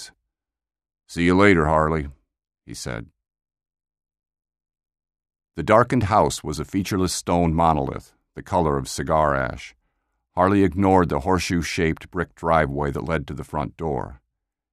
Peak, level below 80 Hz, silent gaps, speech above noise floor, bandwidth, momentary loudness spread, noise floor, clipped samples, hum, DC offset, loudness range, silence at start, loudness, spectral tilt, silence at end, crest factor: -2 dBFS; -40 dBFS; none; over 69 dB; 14 kHz; 17 LU; under -90 dBFS; under 0.1%; none; under 0.1%; 6 LU; 0 s; -21 LUFS; -6 dB/octave; 0.55 s; 22 dB